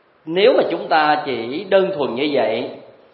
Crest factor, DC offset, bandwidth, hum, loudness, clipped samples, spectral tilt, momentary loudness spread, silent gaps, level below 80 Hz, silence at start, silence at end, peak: 18 dB; under 0.1%; 5.2 kHz; none; -18 LUFS; under 0.1%; -10 dB/octave; 10 LU; none; -70 dBFS; 0.25 s; 0.3 s; 0 dBFS